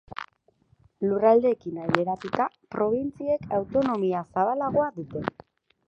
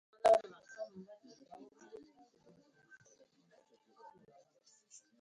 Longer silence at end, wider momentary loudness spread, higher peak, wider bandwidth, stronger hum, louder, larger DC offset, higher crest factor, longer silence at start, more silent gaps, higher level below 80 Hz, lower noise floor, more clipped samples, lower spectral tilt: second, 0.6 s vs 4.2 s; second, 12 LU vs 30 LU; first, 0 dBFS vs -18 dBFS; second, 8 kHz vs 9.4 kHz; neither; first, -26 LUFS vs -34 LUFS; neither; about the same, 26 dB vs 22 dB; about the same, 0.2 s vs 0.25 s; neither; first, -60 dBFS vs -80 dBFS; second, -65 dBFS vs -71 dBFS; neither; first, -8 dB/octave vs -3.5 dB/octave